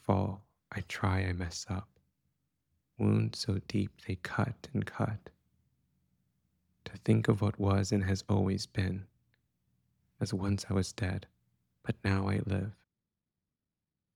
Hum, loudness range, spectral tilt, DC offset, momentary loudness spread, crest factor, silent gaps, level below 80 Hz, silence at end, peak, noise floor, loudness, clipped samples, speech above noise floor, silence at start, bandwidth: none; 5 LU; -6.5 dB/octave; under 0.1%; 12 LU; 22 dB; none; -60 dBFS; 1.4 s; -14 dBFS; -89 dBFS; -34 LUFS; under 0.1%; 57 dB; 0.1 s; 12 kHz